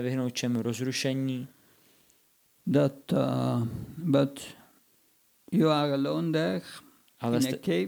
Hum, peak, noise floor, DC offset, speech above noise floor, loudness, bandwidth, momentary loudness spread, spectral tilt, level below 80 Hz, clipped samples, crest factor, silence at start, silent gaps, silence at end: none; -10 dBFS; -66 dBFS; under 0.1%; 38 dB; -29 LUFS; over 20 kHz; 12 LU; -6 dB/octave; -68 dBFS; under 0.1%; 18 dB; 0 s; none; 0 s